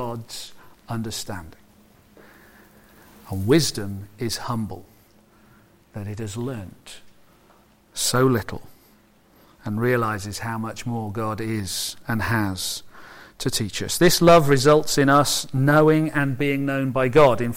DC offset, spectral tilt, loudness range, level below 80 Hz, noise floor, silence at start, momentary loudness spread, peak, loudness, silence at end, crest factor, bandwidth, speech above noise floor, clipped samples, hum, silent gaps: under 0.1%; -5 dB/octave; 15 LU; -46 dBFS; -56 dBFS; 0 s; 20 LU; -4 dBFS; -21 LUFS; 0 s; 18 dB; 16.5 kHz; 35 dB; under 0.1%; none; none